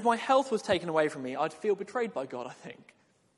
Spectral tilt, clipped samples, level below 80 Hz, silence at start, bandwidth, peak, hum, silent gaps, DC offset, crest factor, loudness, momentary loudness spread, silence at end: -4.5 dB/octave; under 0.1%; -72 dBFS; 0 s; 11.5 kHz; -12 dBFS; none; none; under 0.1%; 20 dB; -30 LUFS; 15 LU; 0.65 s